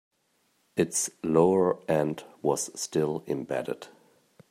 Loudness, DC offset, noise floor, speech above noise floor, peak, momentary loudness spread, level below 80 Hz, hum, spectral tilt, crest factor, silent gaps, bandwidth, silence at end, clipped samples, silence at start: -28 LUFS; under 0.1%; -71 dBFS; 44 dB; -10 dBFS; 10 LU; -68 dBFS; none; -5 dB/octave; 20 dB; none; 16 kHz; 0.65 s; under 0.1%; 0.75 s